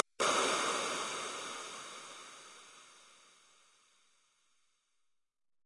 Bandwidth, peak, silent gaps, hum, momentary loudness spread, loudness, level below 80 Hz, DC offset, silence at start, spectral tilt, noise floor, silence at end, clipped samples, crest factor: 11.5 kHz; -12 dBFS; none; none; 24 LU; -35 LUFS; -84 dBFS; under 0.1%; 0.2 s; -0.5 dB/octave; -82 dBFS; 2.5 s; under 0.1%; 28 dB